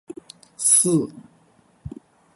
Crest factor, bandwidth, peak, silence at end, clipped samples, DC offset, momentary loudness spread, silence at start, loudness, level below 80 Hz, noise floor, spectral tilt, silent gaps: 20 dB; 12 kHz; -4 dBFS; 0.45 s; under 0.1%; under 0.1%; 25 LU; 0.1 s; -17 LUFS; -56 dBFS; -58 dBFS; -4 dB/octave; none